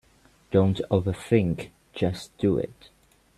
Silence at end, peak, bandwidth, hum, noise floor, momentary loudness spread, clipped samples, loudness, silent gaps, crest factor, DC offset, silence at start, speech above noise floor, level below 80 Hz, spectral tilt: 0.65 s; -8 dBFS; 13 kHz; none; -59 dBFS; 9 LU; under 0.1%; -26 LUFS; none; 20 dB; under 0.1%; 0.5 s; 34 dB; -52 dBFS; -7.5 dB/octave